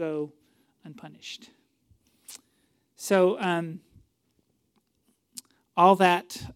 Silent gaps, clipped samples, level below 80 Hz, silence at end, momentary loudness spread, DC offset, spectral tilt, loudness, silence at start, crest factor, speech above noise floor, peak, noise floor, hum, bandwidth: none; under 0.1%; -70 dBFS; 0.05 s; 26 LU; under 0.1%; -5 dB/octave; -23 LUFS; 0 s; 24 dB; 47 dB; -6 dBFS; -72 dBFS; none; 16.5 kHz